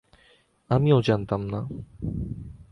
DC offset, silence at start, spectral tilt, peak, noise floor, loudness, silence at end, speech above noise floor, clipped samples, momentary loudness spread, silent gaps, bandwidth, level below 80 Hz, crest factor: under 0.1%; 0.7 s; -8.5 dB/octave; -8 dBFS; -61 dBFS; -26 LUFS; 0.1 s; 36 dB; under 0.1%; 16 LU; none; 6.4 kHz; -44 dBFS; 18 dB